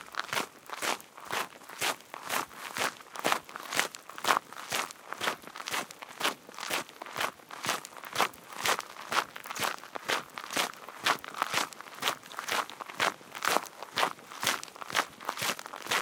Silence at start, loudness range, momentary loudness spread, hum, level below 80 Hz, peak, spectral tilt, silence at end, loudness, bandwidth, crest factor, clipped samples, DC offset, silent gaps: 0 s; 2 LU; 7 LU; none; -80 dBFS; -4 dBFS; -0.5 dB/octave; 0 s; -33 LUFS; 18 kHz; 30 dB; under 0.1%; under 0.1%; none